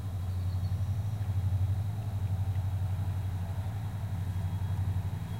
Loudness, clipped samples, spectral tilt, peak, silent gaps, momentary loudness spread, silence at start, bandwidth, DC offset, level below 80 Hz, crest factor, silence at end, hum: -34 LUFS; under 0.1%; -7.5 dB/octave; -22 dBFS; none; 4 LU; 0 s; 15.5 kHz; 0.2%; -48 dBFS; 10 dB; 0 s; none